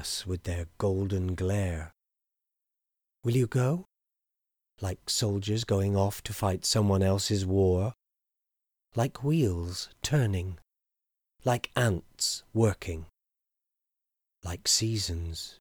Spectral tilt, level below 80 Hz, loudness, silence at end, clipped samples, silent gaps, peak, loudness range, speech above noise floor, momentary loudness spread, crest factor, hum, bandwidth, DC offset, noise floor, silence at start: -5 dB/octave; -50 dBFS; -29 LUFS; 0.1 s; under 0.1%; none; -12 dBFS; 5 LU; 59 dB; 12 LU; 18 dB; none; over 20 kHz; under 0.1%; -87 dBFS; 0 s